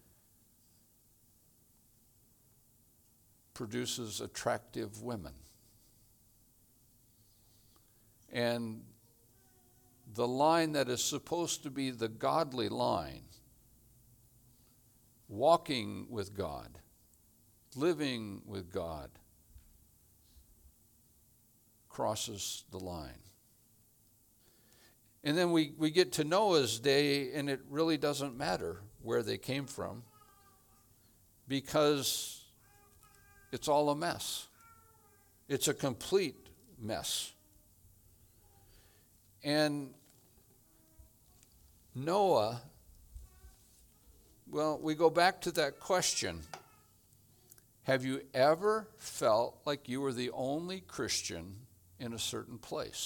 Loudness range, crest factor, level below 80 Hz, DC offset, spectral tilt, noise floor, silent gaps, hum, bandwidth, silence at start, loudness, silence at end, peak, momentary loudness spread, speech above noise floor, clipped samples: 10 LU; 24 dB; -66 dBFS; under 0.1%; -4 dB/octave; -67 dBFS; none; none; 19 kHz; 3.55 s; -34 LUFS; 0 s; -14 dBFS; 17 LU; 34 dB; under 0.1%